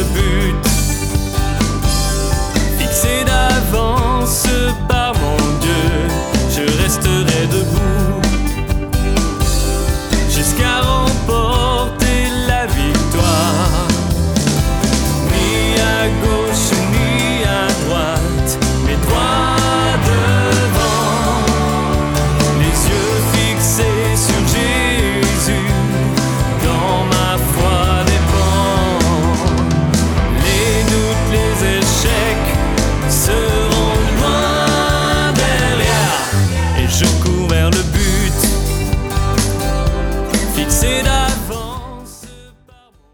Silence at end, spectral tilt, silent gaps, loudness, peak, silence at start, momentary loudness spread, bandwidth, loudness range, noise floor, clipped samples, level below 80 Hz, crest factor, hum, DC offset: 0.7 s; -4.5 dB/octave; none; -15 LUFS; 0 dBFS; 0 s; 3 LU; over 20 kHz; 2 LU; -47 dBFS; under 0.1%; -20 dBFS; 14 dB; none; under 0.1%